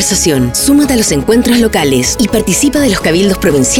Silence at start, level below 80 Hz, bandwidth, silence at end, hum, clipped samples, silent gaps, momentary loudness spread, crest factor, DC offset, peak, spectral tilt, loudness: 0 s; -28 dBFS; 18.5 kHz; 0 s; none; under 0.1%; none; 2 LU; 10 dB; under 0.1%; 0 dBFS; -4 dB/octave; -10 LUFS